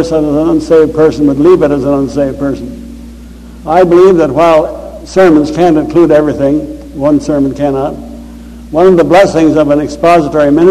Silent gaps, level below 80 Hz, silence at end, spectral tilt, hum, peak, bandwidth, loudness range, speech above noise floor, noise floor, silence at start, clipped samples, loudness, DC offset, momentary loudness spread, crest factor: none; -32 dBFS; 0 s; -7 dB/octave; none; 0 dBFS; 13 kHz; 3 LU; 22 dB; -29 dBFS; 0 s; 2%; -8 LUFS; under 0.1%; 14 LU; 8 dB